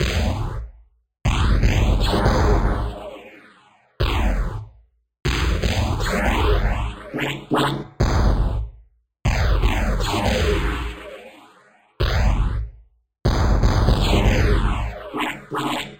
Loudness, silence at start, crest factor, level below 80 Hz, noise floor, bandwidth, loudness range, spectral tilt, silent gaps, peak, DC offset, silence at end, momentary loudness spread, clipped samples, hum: -22 LUFS; 0 s; 16 dB; -24 dBFS; -54 dBFS; 16.5 kHz; 4 LU; -5.5 dB/octave; none; -4 dBFS; under 0.1%; 0.05 s; 12 LU; under 0.1%; none